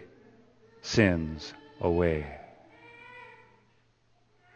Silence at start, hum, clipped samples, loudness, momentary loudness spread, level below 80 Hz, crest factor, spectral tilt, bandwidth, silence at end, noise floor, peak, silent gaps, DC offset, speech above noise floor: 0 s; none; under 0.1%; -28 LUFS; 25 LU; -50 dBFS; 26 dB; -6 dB/octave; 8.8 kHz; 1.3 s; -67 dBFS; -6 dBFS; none; under 0.1%; 39 dB